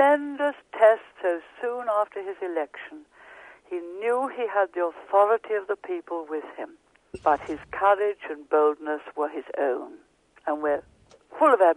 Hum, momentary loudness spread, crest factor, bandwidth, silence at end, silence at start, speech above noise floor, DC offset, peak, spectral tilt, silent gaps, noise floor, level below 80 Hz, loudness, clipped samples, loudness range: none; 15 LU; 20 dB; 10.5 kHz; 0 s; 0 s; 24 dB; under 0.1%; -6 dBFS; -5 dB/octave; none; -49 dBFS; -66 dBFS; -26 LUFS; under 0.1%; 4 LU